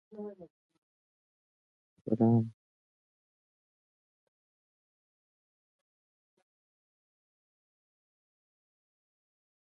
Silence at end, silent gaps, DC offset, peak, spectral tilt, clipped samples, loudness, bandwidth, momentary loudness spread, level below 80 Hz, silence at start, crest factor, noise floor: 7.1 s; 0.50-0.69 s, 0.78-2.05 s; under 0.1%; -16 dBFS; -12.5 dB/octave; under 0.1%; -30 LUFS; 1.8 kHz; 19 LU; -78 dBFS; 0.15 s; 24 dB; under -90 dBFS